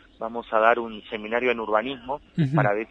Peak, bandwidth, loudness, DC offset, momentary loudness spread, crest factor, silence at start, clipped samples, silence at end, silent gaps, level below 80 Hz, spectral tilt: -4 dBFS; 7 kHz; -25 LUFS; under 0.1%; 13 LU; 20 dB; 0.2 s; under 0.1%; 0.05 s; none; -58 dBFS; -8.5 dB/octave